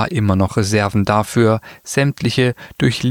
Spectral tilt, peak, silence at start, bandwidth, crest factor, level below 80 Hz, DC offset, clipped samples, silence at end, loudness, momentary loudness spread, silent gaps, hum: -6 dB/octave; -2 dBFS; 0 s; 16.5 kHz; 16 dB; -44 dBFS; under 0.1%; under 0.1%; 0 s; -17 LUFS; 4 LU; none; none